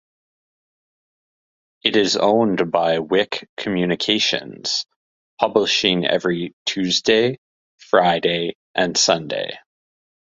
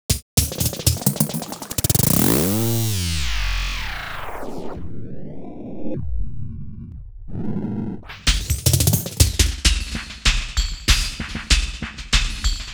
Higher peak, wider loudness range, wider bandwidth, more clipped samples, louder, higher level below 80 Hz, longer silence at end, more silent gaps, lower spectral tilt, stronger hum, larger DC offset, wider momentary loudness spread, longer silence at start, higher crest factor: about the same, 0 dBFS vs 0 dBFS; second, 2 LU vs 12 LU; second, 7.8 kHz vs over 20 kHz; neither; about the same, -19 LUFS vs -21 LUFS; second, -60 dBFS vs -26 dBFS; first, 0.8 s vs 0 s; first, 3.49-3.57 s, 4.96-5.37 s, 6.53-6.66 s, 7.38-7.78 s, 8.55-8.74 s vs 0.22-0.37 s; about the same, -3.5 dB/octave vs -3.5 dB/octave; neither; neither; second, 9 LU vs 18 LU; first, 1.85 s vs 0.1 s; about the same, 20 dB vs 20 dB